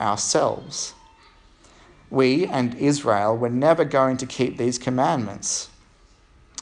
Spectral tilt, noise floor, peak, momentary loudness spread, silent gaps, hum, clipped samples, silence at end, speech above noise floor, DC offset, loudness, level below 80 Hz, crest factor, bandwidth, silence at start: -4.5 dB/octave; -54 dBFS; -4 dBFS; 10 LU; none; none; under 0.1%; 0.95 s; 33 dB; under 0.1%; -22 LUFS; -56 dBFS; 18 dB; 11 kHz; 0 s